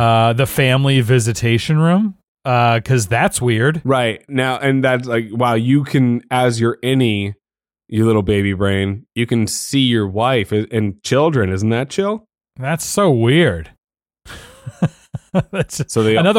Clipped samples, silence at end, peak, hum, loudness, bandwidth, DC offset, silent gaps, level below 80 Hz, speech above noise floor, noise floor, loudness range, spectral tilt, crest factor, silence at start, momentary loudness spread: under 0.1%; 0 s; -4 dBFS; none; -16 LUFS; 16.5 kHz; under 0.1%; 2.28-2.35 s, 13.78-13.82 s; -46 dBFS; 42 dB; -57 dBFS; 3 LU; -5.5 dB/octave; 12 dB; 0 s; 8 LU